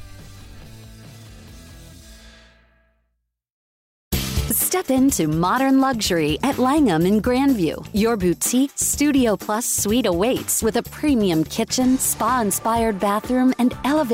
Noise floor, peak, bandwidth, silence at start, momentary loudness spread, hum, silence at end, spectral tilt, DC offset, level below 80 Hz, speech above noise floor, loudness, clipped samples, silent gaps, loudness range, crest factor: -74 dBFS; -8 dBFS; 16.5 kHz; 0 s; 4 LU; none; 0 s; -4 dB/octave; under 0.1%; -40 dBFS; 55 dB; -19 LUFS; under 0.1%; 3.52-4.11 s; 5 LU; 14 dB